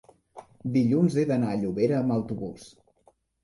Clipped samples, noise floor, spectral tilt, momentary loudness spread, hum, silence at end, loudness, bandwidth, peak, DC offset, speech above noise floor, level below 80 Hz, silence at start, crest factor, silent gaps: under 0.1%; -64 dBFS; -8.5 dB/octave; 14 LU; none; 0.75 s; -26 LUFS; 11.5 kHz; -12 dBFS; under 0.1%; 39 dB; -60 dBFS; 0.35 s; 16 dB; none